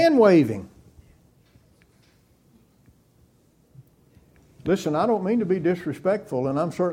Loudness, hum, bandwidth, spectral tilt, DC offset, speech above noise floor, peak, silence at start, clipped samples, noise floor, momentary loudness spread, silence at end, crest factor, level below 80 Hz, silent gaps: -22 LUFS; none; 15 kHz; -7 dB/octave; under 0.1%; 39 dB; -4 dBFS; 0 s; under 0.1%; -60 dBFS; 10 LU; 0 s; 20 dB; -60 dBFS; none